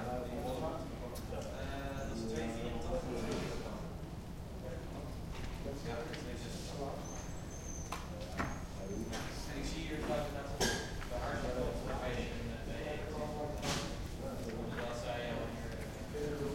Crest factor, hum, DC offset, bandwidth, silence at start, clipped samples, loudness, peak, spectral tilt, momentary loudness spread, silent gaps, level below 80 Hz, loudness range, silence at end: 20 dB; none; under 0.1%; 16.5 kHz; 0 s; under 0.1%; -41 LUFS; -20 dBFS; -5 dB/octave; 7 LU; none; -48 dBFS; 5 LU; 0 s